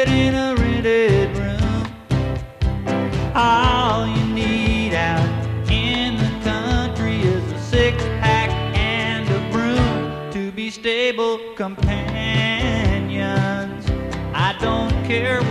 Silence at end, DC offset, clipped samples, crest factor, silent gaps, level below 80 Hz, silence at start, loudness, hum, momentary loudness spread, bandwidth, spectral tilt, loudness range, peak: 0 s; under 0.1%; under 0.1%; 16 dB; none; -30 dBFS; 0 s; -20 LUFS; none; 8 LU; 12 kHz; -6 dB/octave; 2 LU; -4 dBFS